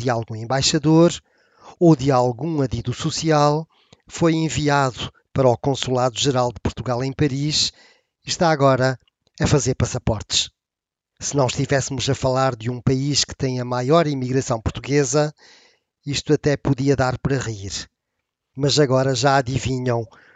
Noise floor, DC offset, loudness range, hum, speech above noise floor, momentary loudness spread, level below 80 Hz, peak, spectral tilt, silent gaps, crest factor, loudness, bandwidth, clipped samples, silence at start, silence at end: -87 dBFS; under 0.1%; 3 LU; none; 67 dB; 10 LU; -44 dBFS; -4 dBFS; -5 dB/octave; none; 18 dB; -20 LUFS; 9.2 kHz; under 0.1%; 0 s; 0.3 s